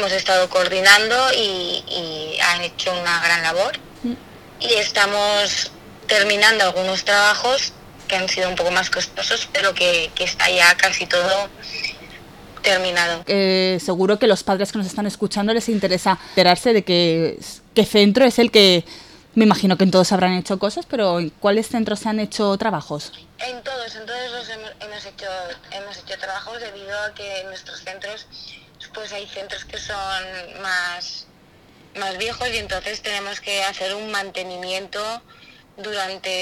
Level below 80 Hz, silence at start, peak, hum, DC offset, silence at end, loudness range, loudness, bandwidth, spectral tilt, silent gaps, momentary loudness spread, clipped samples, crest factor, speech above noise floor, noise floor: -52 dBFS; 0 s; 0 dBFS; none; under 0.1%; 0 s; 14 LU; -18 LUFS; 18.5 kHz; -3.5 dB/octave; none; 18 LU; under 0.1%; 20 dB; 30 dB; -50 dBFS